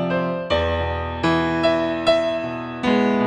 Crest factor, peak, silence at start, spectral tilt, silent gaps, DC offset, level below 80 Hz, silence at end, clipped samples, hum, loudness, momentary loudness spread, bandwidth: 16 dB; -6 dBFS; 0 s; -6.5 dB/octave; none; under 0.1%; -42 dBFS; 0 s; under 0.1%; none; -21 LUFS; 6 LU; 9.4 kHz